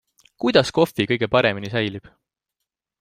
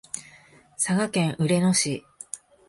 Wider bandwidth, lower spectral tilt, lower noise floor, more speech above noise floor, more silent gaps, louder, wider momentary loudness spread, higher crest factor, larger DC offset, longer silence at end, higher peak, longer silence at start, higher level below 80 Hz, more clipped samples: first, 15.5 kHz vs 11.5 kHz; about the same, -5.5 dB/octave vs -4.5 dB/octave; first, -83 dBFS vs -53 dBFS; first, 63 dB vs 30 dB; neither; first, -20 LUFS vs -24 LUFS; second, 8 LU vs 17 LU; about the same, 20 dB vs 16 dB; neither; first, 1 s vs 0.35 s; first, -2 dBFS vs -10 dBFS; first, 0.4 s vs 0.15 s; first, -56 dBFS vs -64 dBFS; neither